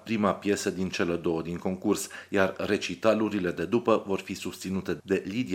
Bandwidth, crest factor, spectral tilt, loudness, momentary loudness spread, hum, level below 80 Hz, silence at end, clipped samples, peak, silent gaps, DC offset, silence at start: 16.5 kHz; 20 dB; -5 dB/octave; -28 LUFS; 7 LU; none; -62 dBFS; 0 s; under 0.1%; -8 dBFS; none; under 0.1%; 0.05 s